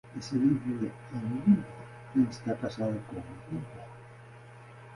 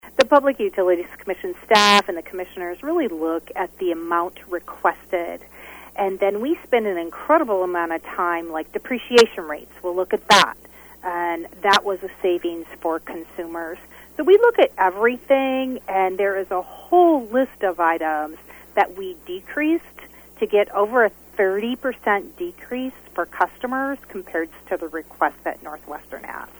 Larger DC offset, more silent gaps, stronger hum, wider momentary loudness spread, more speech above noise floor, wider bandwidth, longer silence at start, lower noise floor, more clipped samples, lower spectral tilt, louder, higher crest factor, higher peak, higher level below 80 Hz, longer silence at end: neither; neither; neither; first, 24 LU vs 17 LU; about the same, 20 dB vs 23 dB; second, 11.5 kHz vs over 20 kHz; about the same, 0.05 s vs 0.05 s; first, -50 dBFS vs -44 dBFS; neither; first, -8 dB/octave vs -3.5 dB/octave; second, -31 LUFS vs -21 LUFS; about the same, 18 dB vs 20 dB; second, -12 dBFS vs 0 dBFS; second, -62 dBFS vs -56 dBFS; second, 0 s vs 0.15 s